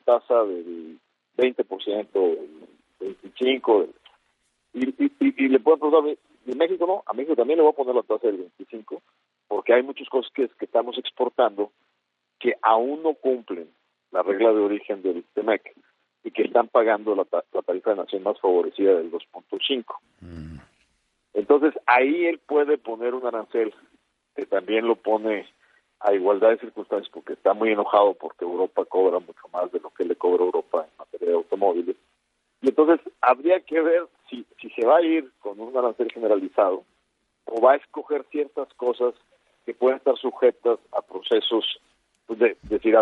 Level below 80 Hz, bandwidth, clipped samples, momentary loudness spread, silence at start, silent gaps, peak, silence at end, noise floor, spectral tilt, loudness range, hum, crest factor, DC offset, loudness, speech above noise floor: -66 dBFS; 4.4 kHz; under 0.1%; 17 LU; 0.05 s; none; -4 dBFS; 0 s; -76 dBFS; -6.5 dB/octave; 3 LU; none; 20 dB; under 0.1%; -23 LUFS; 54 dB